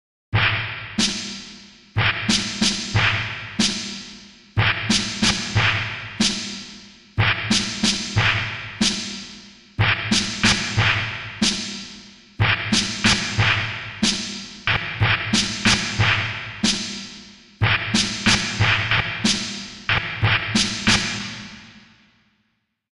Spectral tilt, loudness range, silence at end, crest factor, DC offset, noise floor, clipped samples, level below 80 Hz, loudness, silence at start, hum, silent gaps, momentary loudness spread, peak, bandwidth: -3 dB/octave; 2 LU; 1.2 s; 20 dB; under 0.1%; -70 dBFS; under 0.1%; -42 dBFS; -20 LUFS; 0.3 s; none; none; 13 LU; -2 dBFS; 11.5 kHz